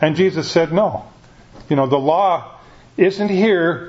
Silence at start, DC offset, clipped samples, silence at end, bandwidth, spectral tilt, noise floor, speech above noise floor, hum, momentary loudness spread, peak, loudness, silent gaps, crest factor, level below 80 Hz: 0 s; under 0.1%; under 0.1%; 0 s; 7.8 kHz; -6.5 dB/octave; -43 dBFS; 27 dB; none; 7 LU; 0 dBFS; -17 LUFS; none; 18 dB; -52 dBFS